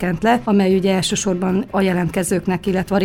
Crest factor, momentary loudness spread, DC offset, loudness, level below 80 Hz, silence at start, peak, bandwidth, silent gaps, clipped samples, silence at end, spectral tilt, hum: 14 dB; 4 LU; under 0.1%; -18 LUFS; -42 dBFS; 0 s; -4 dBFS; 16 kHz; none; under 0.1%; 0 s; -5.5 dB/octave; none